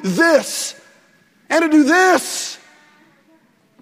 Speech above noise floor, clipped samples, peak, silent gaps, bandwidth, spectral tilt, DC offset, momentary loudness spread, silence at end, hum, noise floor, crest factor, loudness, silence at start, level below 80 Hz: 40 dB; under 0.1%; 0 dBFS; none; 16 kHz; -3.5 dB/octave; under 0.1%; 15 LU; 1.25 s; none; -55 dBFS; 18 dB; -15 LUFS; 0 s; -68 dBFS